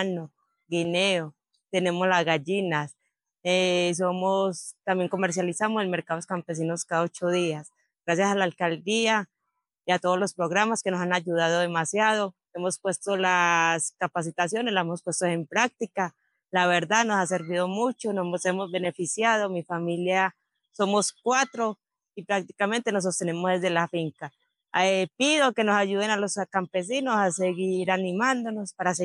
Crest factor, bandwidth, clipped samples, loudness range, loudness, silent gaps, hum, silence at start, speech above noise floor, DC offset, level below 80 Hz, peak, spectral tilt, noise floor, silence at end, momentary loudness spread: 20 dB; 12 kHz; under 0.1%; 3 LU; -26 LUFS; none; none; 0 s; 56 dB; under 0.1%; -88 dBFS; -6 dBFS; -4 dB/octave; -81 dBFS; 0 s; 8 LU